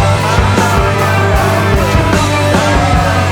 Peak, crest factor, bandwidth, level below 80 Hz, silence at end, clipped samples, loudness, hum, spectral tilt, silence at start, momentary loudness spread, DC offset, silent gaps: 0 dBFS; 10 dB; 18 kHz; -20 dBFS; 0 s; under 0.1%; -11 LUFS; none; -5.5 dB/octave; 0 s; 1 LU; under 0.1%; none